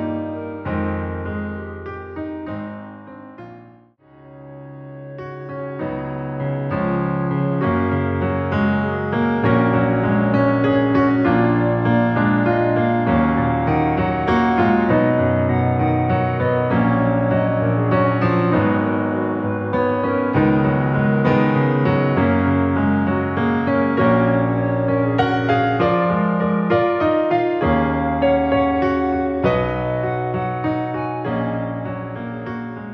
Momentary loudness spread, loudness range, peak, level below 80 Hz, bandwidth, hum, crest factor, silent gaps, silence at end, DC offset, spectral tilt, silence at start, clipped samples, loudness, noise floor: 12 LU; 11 LU; -4 dBFS; -42 dBFS; 5.8 kHz; none; 14 dB; none; 0 s; under 0.1%; -10 dB/octave; 0 s; under 0.1%; -19 LUFS; -49 dBFS